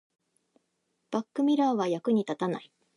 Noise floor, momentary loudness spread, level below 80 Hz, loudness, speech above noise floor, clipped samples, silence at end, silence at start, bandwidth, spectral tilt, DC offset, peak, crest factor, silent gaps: -78 dBFS; 9 LU; -82 dBFS; -29 LUFS; 50 dB; under 0.1%; 0.35 s; 1.1 s; 10.5 kHz; -6.5 dB/octave; under 0.1%; -16 dBFS; 14 dB; none